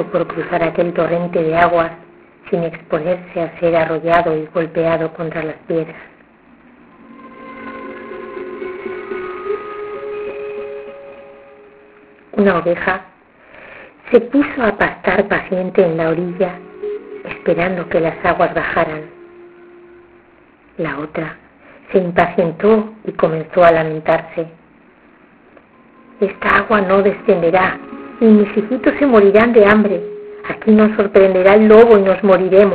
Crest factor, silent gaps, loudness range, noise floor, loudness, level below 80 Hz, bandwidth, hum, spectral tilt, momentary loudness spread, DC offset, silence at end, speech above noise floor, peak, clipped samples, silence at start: 16 dB; none; 15 LU; -48 dBFS; -15 LUFS; -46 dBFS; 4 kHz; none; -10.5 dB/octave; 18 LU; under 0.1%; 0 s; 34 dB; 0 dBFS; under 0.1%; 0 s